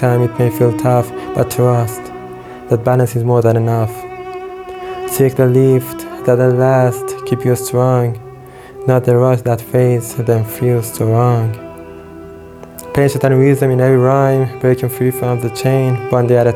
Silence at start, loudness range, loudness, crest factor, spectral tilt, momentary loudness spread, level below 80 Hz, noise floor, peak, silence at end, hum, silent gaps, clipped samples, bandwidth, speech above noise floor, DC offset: 0 s; 3 LU; -14 LUFS; 14 dB; -7.5 dB/octave; 18 LU; -48 dBFS; -34 dBFS; 0 dBFS; 0 s; none; none; under 0.1%; 16.5 kHz; 21 dB; under 0.1%